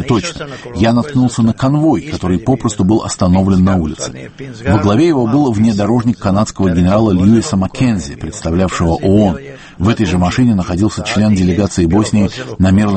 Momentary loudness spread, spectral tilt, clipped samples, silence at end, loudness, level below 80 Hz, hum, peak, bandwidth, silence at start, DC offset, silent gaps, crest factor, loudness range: 9 LU; -6.5 dB/octave; under 0.1%; 0 s; -13 LUFS; -34 dBFS; none; 0 dBFS; 8.8 kHz; 0 s; under 0.1%; none; 12 dB; 2 LU